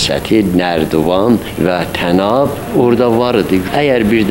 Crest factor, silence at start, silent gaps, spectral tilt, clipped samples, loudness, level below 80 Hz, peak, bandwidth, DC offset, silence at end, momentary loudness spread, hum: 12 dB; 0 s; none; -6 dB/octave; under 0.1%; -13 LUFS; -36 dBFS; 0 dBFS; 16.5 kHz; 0.2%; 0 s; 3 LU; none